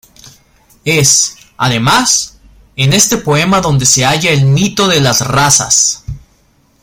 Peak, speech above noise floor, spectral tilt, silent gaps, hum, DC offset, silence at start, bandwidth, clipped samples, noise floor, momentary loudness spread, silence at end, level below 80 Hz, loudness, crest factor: 0 dBFS; 41 dB; -3 dB/octave; none; none; under 0.1%; 0.25 s; over 20 kHz; under 0.1%; -52 dBFS; 9 LU; 0.65 s; -38 dBFS; -9 LUFS; 12 dB